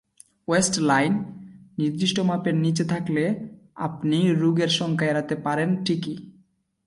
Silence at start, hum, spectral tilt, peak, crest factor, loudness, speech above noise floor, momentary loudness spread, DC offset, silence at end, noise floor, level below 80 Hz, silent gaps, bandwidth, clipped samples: 0.5 s; none; -5 dB/octave; -8 dBFS; 16 dB; -23 LUFS; 39 dB; 13 LU; under 0.1%; 0.55 s; -62 dBFS; -62 dBFS; none; 11.5 kHz; under 0.1%